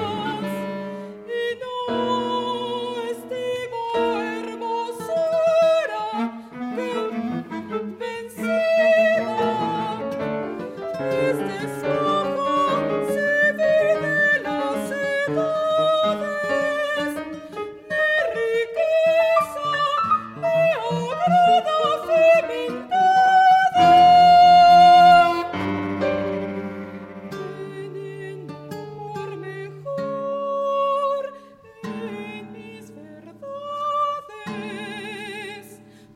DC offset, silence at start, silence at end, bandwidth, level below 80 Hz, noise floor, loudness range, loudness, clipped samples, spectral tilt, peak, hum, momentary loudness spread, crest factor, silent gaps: under 0.1%; 0 s; 0.4 s; 14 kHz; -62 dBFS; -46 dBFS; 16 LU; -20 LUFS; under 0.1%; -5 dB/octave; -4 dBFS; none; 18 LU; 16 dB; none